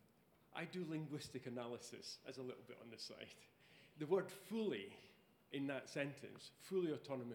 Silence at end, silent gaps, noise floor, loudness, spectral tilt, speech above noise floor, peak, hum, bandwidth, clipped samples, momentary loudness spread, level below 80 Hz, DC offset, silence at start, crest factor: 0 s; none; -74 dBFS; -47 LUFS; -5.5 dB/octave; 27 dB; -26 dBFS; none; 19.5 kHz; under 0.1%; 16 LU; -88 dBFS; under 0.1%; 0.5 s; 22 dB